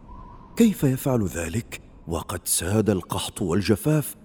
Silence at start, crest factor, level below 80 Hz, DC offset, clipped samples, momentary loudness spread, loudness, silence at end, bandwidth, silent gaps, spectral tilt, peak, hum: 0 s; 18 dB; -46 dBFS; under 0.1%; under 0.1%; 11 LU; -24 LUFS; 0.1 s; over 20 kHz; none; -5 dB/octave; -6 dBFS; none